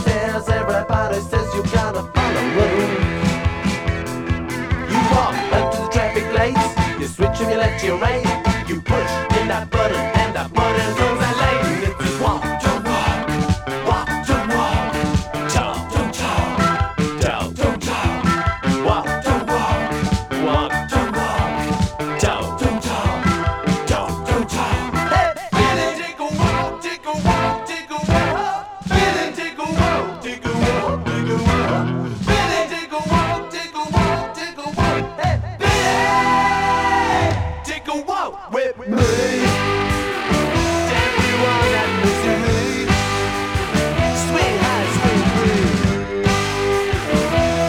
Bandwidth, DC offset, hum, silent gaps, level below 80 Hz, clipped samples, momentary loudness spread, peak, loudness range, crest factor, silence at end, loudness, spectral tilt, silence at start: 17 kHz; under 0.1%; none; none; -30 dBFS; under 0.1%; 6 LU; 0 dBFS; 3 LU; 18 dB; 0 s; -19 LUFS; -5 dB/octave; 0 s